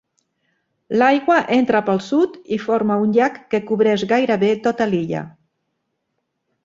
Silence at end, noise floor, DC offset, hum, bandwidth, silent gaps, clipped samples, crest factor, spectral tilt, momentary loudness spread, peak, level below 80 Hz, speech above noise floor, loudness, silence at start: 1.35 s; -74 dBFS; under 0.1%; none; 7.6 kHz; none; under 0.1%; 18 dB; -6.5 dB/octave; 8 LU; -2 dBFS; -62 dBFS; 57 dB; -18 LUFS; 0.9 s